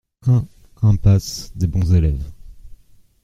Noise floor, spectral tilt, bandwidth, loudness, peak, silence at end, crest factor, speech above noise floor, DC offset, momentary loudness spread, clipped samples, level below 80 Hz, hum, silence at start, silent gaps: -45 dBFS; -7.5 dB/octave; 13.5 kHz; -18 LUFS; -2 dBFS; 0.5 s; 16 dB; 29 dB; under 0.1%; 13 LU; under 0.1%; -30 dBFS; none; 0.25 s; none